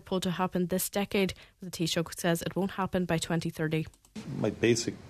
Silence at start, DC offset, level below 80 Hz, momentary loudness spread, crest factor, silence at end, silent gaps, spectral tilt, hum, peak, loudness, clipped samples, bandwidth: 0.05 s; under 0.1%; -56 dBFS; 9 LU; 18 dB; 0 s; none; -5 dB/octave; none; -14 dBFS; -31 LUFS; under 0.1%; 14 kHz